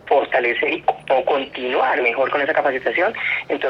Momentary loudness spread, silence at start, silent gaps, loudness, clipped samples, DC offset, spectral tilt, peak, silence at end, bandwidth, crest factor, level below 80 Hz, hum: 4 LU; 0.05 s; none; -19 LUFS; under 0.1%; under 0.1%; -5.5 dB/octave; -4 dBFS; 0 s; 6.2 kHz; 16 dB; -60 dBFS; none